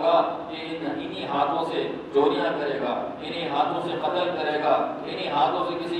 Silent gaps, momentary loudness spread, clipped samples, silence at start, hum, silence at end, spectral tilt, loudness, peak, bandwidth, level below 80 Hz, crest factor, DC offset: none; 8 LU; under 0.1%; 0 s; none; 0 s; -6 dB/octave; -26 LUFS; -8 dBFS; 10.5 kHz; -62 dBFS; 18 dB; under 0.1%